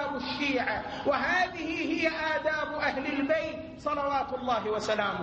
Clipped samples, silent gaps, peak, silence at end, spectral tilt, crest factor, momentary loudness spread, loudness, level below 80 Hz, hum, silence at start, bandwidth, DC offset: under 0.1%; none; -14 dBFS; 0 s; -4.5 dB/octave; 16 dB; 4 LU; -29 LUFS; -56 dBFS; none; 0 s; 8.6 kHz; under 0.1%